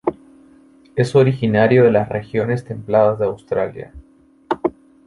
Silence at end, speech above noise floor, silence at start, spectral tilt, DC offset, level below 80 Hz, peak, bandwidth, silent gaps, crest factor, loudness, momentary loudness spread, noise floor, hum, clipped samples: 0.35 s; 32 dB; 0.05 s; -8 dB/octave; under 0.1%; -50 dBFS; -2 dBFS; 11.5 kHz; none; 16 dB; -18 LUFS; 13 LU; -49 dBFS; none; under 0.1%